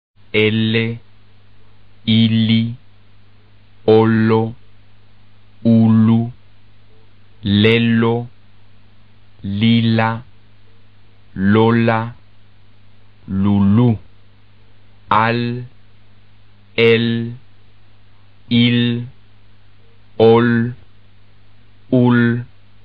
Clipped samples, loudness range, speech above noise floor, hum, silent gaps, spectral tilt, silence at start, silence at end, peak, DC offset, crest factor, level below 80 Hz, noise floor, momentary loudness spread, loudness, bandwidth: under 0.1%; 4 LU; 36 dB; 50 Hz at -40 dBFS; none; -5.5 dB/octave; 0.35 s; 0.4 s; 0 dBFS; 1%; 18 dB; -52 dBFS; -50 dBFS; 15 LU; -15 LUFS; 5 kHz